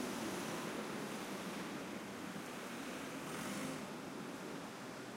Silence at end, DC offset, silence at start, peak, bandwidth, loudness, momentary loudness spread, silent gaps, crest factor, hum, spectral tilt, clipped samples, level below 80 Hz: 0 s; under 0.1%; 0 s; -30 dBFS; 16 kHz; -45 LUFS; 5 LU; none; 16 dB; none; -4 dB/octave; under 0.1%; -76 dBFS